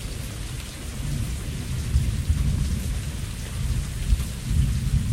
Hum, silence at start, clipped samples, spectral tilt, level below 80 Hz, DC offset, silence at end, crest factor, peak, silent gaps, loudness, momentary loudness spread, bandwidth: none; 0 s; under 0.1%; -5.5 dB/octave; -28 dBFS; under 0.1%; 0 s; 18 dB; -8 dBFS; none; -28 LUFS; 9 LU; 16 kHz